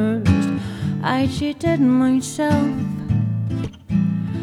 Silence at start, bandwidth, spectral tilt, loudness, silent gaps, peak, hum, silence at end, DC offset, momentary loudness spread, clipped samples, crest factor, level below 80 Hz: 0 s; 15 kHz; -7 dB/octave; -20 LUFS; none; -4 dBFS; none; 0 s; under 0.1%; 8 LU; under 0.1%; 16 dB; -42 dBFS